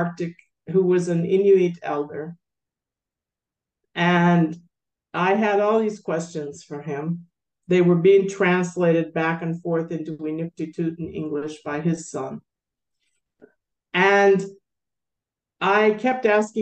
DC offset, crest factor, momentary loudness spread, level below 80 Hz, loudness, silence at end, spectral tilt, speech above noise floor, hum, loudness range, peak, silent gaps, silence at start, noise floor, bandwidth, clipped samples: under 0.1%; 16 dB; 15 LU; -68 dBFS; -21 LUFS; 0 s; -6.5 dB/octave; 68 dB; none; 7 LU; -6 dBFS; none; 0 s; -89 dBFS; 8.8 kHz; under 0.1%